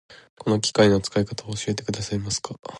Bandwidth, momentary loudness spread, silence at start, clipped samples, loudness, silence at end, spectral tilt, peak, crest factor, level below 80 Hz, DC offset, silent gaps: 11.5 kHz; 10 LU; 0.1 s; under 0.1%; -24 LUFS; 0 s; -4.5 dB/octave; -4 dBFS; 20 dB; -50 dBFS; under 0.1%; 0.30-0.37 s, 2.59-2.63 s